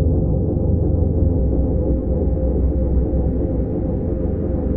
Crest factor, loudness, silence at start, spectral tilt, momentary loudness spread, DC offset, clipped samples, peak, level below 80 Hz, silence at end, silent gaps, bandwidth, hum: 12 dB; -20 LUFS; 0 s; -15 dB/octave; 4 LU; under 0.1%; under 0.1%; -6 dBFS; -22 dBFS; 0 s; none; 2 kHz; none